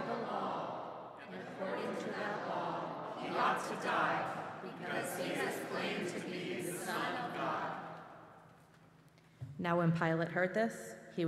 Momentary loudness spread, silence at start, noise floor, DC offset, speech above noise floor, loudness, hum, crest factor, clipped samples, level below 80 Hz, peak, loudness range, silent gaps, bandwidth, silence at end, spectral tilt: 14 LU; 0 s; -63 dBFS; under 0.1%; 29 dB; -38 LUFS; none; 20 dB; under 0.1%; -78 dBFS; -18 dBFS; 4 LU; none; 15.5 kHz; 0 s; -5 dB/octave